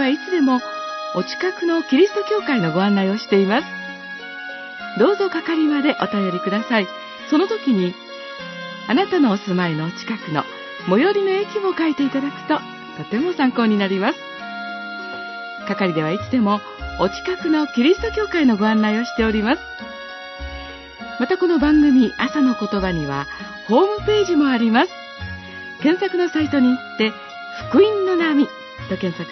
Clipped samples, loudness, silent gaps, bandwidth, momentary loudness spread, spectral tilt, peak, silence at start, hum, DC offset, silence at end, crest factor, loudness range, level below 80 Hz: under 0.1%; -19 LUFS; none; 6.2 kHz; 15 LU; -6.5 dB/octave; -2 dBFS; 0 s; none; under 0.1%; 0 s; 16 dB; 3 LU; -46 dBFS